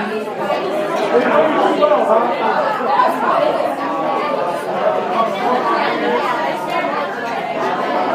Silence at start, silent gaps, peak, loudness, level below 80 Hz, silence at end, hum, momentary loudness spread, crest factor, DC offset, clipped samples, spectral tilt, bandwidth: 0 s; none; 0 dBFS; -17 LUFS; -68 dBFS; 0 s; none; 6 LU; 16 dB; under 0.1%; under 0.1%; -5 dB/octave; 15.5 kHz